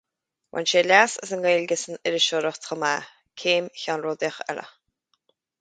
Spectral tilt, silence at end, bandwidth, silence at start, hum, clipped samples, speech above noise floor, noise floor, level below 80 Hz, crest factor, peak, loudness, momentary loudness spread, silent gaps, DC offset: -2 dB/octave; 0.9 s; 9.4 kHz; 0.55 s; none; under 0.1%; 56 dB; -80 dBFS; -76 dBFS; 24 dB; -2 dBFS; -23 LUFS; 14 LU; none; under 0.1%